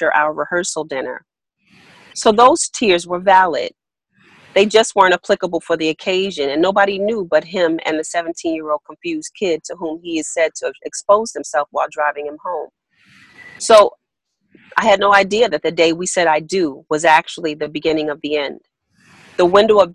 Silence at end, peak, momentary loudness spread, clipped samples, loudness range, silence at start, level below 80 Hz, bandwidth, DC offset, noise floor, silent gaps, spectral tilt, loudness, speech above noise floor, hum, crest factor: 0 s; 0 dBFS; 14 LU; under 0.1%; 6 LU; 0 s; -56 dBFS; 11.5 kHz; under 0.1%; -72 dBFS; none; -3 dB/octave; -16 LUFS; 56 dB; none; 16 dB